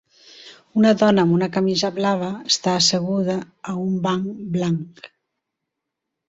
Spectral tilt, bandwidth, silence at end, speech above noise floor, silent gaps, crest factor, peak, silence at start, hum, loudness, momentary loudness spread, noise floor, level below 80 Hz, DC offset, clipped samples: -5 dB/octave; 8 kHz; 1.2 s; 62 dB; none; 18 dB; -2 dBFS; 0.35 s; none; -20 LUFS; 11 LU; -81 dBFS; -60 dBFS; under 0.1%; under 0.1%